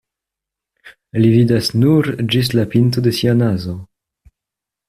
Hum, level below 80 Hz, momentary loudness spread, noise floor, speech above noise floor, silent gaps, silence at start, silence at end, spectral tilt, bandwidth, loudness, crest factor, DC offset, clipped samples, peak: none; -48 dBFS; 10 LU; -84 dBFS; 70 dB; none; 0.85 s; 1.05 s; -7 dB/octave; 14.5 kHz; -15 LUFS; 14 dB; under 0.1%; under 0.1%; -2 dBFS